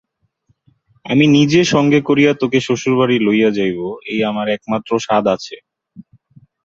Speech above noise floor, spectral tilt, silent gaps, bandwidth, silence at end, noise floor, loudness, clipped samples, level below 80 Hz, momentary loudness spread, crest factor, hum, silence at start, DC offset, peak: 47 dB; -5.5 dB/octave; none; 7.8 kHz; 0.65 s; -62 dBFS; -15 LUFS; under 0.1%; -56 dBFS; 9 LU; 14 dB; none; 1.05 s; under 0.1%; -2 dBFS